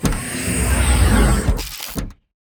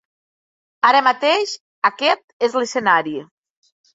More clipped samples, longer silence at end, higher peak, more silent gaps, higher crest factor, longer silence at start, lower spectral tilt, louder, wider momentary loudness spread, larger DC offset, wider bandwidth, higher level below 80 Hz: neither; second, 0.4 s vs 0.7 s; about the same, -2 dBFS vs -2 dBFS; second, none vs 1.60-1.82 s, 2.24-2.40 s; about the same, 16 dB vs 18 dB; second, 0 s vs 0.85 s; first, -4.5 dB/octave vs -2.5 dB/octave; about the same, -19 LUFS vs -17 LUFS; first, 13 LU vs 9 LU; neither; first, over 20 kHz vs 8 kHz; first, -20 dBFS vs -70 dBFS